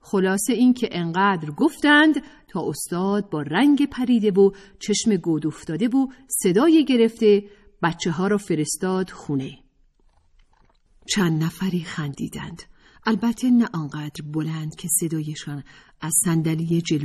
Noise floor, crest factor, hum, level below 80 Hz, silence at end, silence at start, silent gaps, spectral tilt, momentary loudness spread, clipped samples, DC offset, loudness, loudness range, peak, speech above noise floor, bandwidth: -59 dBFS; 16 dB; none; -56 dBFS; 0 s; 0.05 s; none; -5 dB/octave; 13 LU; under 0.1%; under 0.1%; -21 LUFS; 7 LU; -6 dBFS; 38 dB; 14 kHz